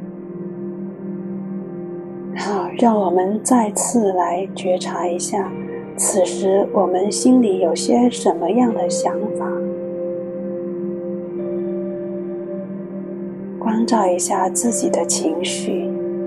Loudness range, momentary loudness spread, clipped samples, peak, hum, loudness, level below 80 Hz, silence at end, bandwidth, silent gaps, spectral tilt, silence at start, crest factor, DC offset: 8 LU; 13 LU; under 0.1%; -2 dBFS; none; -20 LUFS; -62 dBFS; 0 s; 13 kHz; none; -4.5 dB/octave; 0 s; 16 dB; under 0.1%